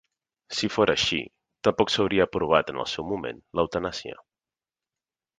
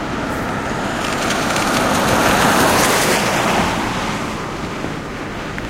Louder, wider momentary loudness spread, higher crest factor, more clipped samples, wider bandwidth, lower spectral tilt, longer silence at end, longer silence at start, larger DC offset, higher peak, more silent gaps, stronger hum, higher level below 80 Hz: second, -25 LUFS vs -17 LUFS; about the same, 11 LU vs 12 LU; first, 22 dB vs 16 dB; neither; second, 9.6 kHz vs 16 kHz; about the same, -4 dB/octave vs -3.5 dB/octave; first, 1.25 s vs 0 s; first, 0.5 s vs 0 s; neither; second, -4 dBFS vs 0 dBFS; neither; neither; second, -54 dBFS vs -36 dBFS